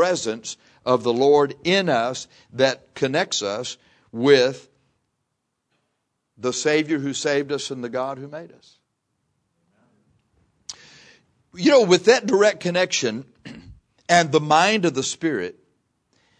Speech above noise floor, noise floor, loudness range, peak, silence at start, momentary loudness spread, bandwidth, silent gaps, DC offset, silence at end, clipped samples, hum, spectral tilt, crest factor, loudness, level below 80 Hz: 56 dB; -77 dBFS; 9 LU; -2 dBFS; 0 s; 22 LU; 10.5 kHz; none; under 0.1%; 0.9 s; under 0.1%; none; -4 dB/octave; 22 dB; -20 LUFS; -64 dBFS